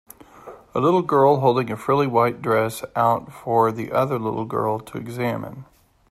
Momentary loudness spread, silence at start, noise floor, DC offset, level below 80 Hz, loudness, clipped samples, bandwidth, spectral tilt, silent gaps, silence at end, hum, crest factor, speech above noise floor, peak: 10 LU; 0.35 s; -43 dBFS; under 0.1%; -58 dBFS; -21 LUFS; under 0.1%; 14.5 kHz; -7 dB/octave; none; 0.45 s; none; 18 dB; 23 dB; -4 dBFS